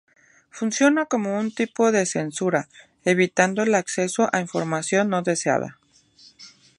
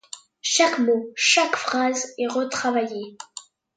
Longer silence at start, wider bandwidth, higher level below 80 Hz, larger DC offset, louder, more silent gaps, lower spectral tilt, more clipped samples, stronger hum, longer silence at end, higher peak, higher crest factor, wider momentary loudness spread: first, 0.55 s vs 0.15 s; first, 11.5 kHz vs 9.6 kHz; first, -70 dBFS vs -76 dBFS; neither; about the same, -22 LUFS vs -21 LUFS; neither; first, -4.5 dB/octave vs -1 dB/octave; neither; neither; about the same, 0.3 s vs 0.35 s; about the same, -2 dBFS vs -4 dBFS; about the same, 22 dB vs 18 dB; second, 7 LU vs 20 LU